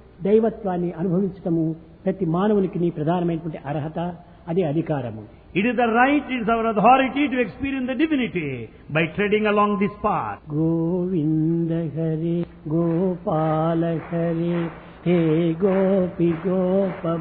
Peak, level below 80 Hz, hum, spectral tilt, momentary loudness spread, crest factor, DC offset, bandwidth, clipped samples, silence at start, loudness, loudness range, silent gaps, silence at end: -2 dBFS; -50 dBFS; none; -11.5 dB/octave; 9 LU; 18 dB; under 0.1%; 4.2 kHz; under 0.1%; 0.2 s; -22 LUFS; 4 LU; none; 0 s